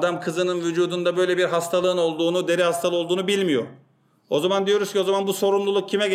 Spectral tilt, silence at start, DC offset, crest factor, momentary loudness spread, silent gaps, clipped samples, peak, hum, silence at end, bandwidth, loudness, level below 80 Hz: -4.5 dB/octave; 0 s; under 0.1%; 14 dB; 3 LU; none; under 0.1%; -8 dBFS; none; 0 s; 15.5 kHz; -22 LUFS; -76 dBFS